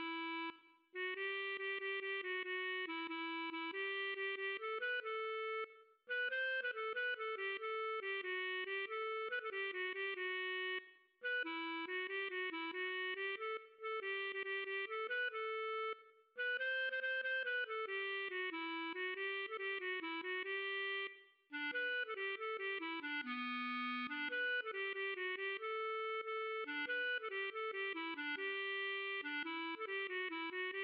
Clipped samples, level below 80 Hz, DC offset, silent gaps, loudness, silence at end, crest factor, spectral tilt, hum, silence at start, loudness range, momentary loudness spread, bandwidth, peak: under 0.1%; under -90 dBFS; under 0.1%; none; -41 LUFS; 0 s; 10 dB; 3 dB/octave; none; 0 s; 1 LU; 4 LU; 5.6 kHz; -32 dBFS